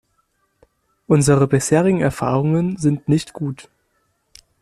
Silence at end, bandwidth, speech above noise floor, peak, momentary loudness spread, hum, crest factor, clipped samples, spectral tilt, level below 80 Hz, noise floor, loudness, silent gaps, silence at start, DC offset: 1 s; 13.5 kHz; 50 dB; -2 dBFS; 13 LU; none; 16 dB; under 0.1%; -6.5 dB/octave; -48 dBFS; -67 dBFS; -18 LUFS; none; 1.1 s; under 0.1%